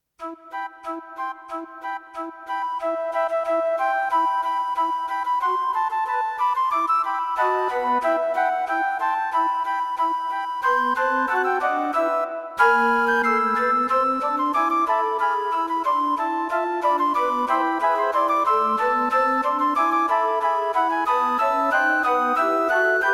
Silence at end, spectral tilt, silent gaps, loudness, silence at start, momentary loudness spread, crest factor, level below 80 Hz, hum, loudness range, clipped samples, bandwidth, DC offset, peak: 0 s; -3.5 dB/octave; none; -21 LUFS; 0.2 s; 10 LU; 18 dB; -62 dBFS; none; 4 LU; under 0.1%; 15 kHz; under 0.1%; -4 dBFS